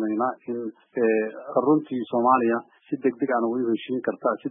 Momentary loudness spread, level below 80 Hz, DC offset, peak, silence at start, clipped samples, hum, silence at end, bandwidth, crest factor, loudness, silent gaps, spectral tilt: 11 LU; -78 dBFS; under 0.1%; -6 dBFS; 0 s; under 0.1%; none; 0 s; 3.8 kHz; 18 dB; -25 LUFS; none; -11 dB/octave